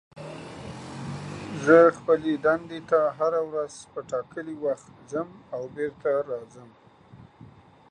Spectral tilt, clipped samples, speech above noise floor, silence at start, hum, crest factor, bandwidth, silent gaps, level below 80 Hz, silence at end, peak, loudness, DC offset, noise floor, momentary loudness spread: -6.5 dB/octave; under 0.1%; 26 dB; 0.15 s; none; 22 dB; 10 kHz; none; -62 dBFS; 0.65 s; -4 dBFS; -26 LUFS; under 0.1%; -51 dBFS; 20 LU